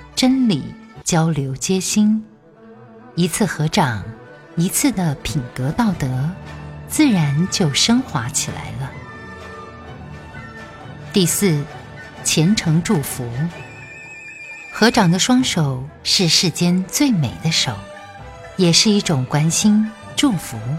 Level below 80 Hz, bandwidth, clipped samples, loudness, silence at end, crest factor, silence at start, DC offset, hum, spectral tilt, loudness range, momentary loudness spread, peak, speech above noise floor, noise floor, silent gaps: -46 dBFS; 16.5 kHz; under 0.1%; -17 LUFS; 0 s; 18 dB; 0 s; under 0.1%; none; -4 dB/octave; 5 LU; 20 LU; 0 dBFS; 26 dB; -44 dBFS; none